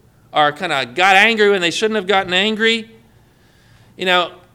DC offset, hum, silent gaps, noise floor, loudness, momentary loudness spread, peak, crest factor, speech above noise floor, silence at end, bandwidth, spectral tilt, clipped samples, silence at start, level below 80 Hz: under 0.1%; none; none; -51 dBFS; -15 LUFS; 10 LU; 0 dBFS; 18 dB; 35 dB; 0.2 s; 16.5 kHz; -3 dB/octave; under 0.1%; 0.35 s; -58 dBFS